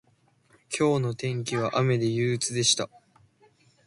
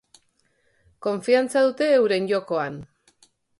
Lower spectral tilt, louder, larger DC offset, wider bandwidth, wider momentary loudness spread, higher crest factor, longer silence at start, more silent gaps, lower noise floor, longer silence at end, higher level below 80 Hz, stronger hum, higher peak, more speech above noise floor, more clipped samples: about the same, -4 dB/octave vs -5 dB/octave; second, -26 LUFS vs -22 LUFS; neither; about the same, 11.5 kHz vs 11.5 kHz; second, 7 LU vs 12 LU; about the same, 18 dB vs 18 dB; second, 0.7 s vs 1 s; neither; about the same, -64 dBFS vs -67 dBFS; first, 1 s vs 0.75 s; about the same, -64 dBFS vs -66 dBFS; neither; second, -10 dBFS vs -6 dBFS; second, 39 dB vs 45 dB; neither